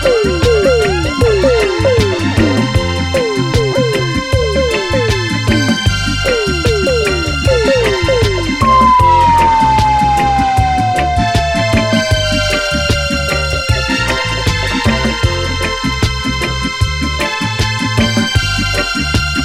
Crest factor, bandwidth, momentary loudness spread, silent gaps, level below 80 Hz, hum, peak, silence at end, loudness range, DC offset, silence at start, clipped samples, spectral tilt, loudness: 12 dB; 16 kHz; 5 LU; none; -22 dBFS; none; 0 dBFS; 0 s; 4 LU; under 0.1%; 0 s; under 0.1%; -5 dB/octave; -13 LUFS